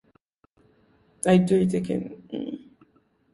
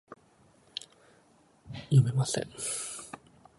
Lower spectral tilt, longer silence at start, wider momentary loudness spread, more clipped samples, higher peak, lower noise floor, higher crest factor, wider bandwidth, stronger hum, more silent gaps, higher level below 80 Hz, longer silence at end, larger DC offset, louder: first, -7 dB/octave vs -5 dB/octave; first, 1.25 s vs 0.1 s; second, 17 LU vs 21 LU; neither; first, -6 dBFS vs -12 dBFS; about the same, -65 dBFS vs -63 dBFS; about the same, 20 dB vs 20 dB; about the same, 11.5 kHz vs 11.5 kHz; neither; neither; about the same, -60 dBFS vs -64 dBFS; first, 0.75 s vs 0.45 s; neither; first, -24 LUFS vs -30 LUFS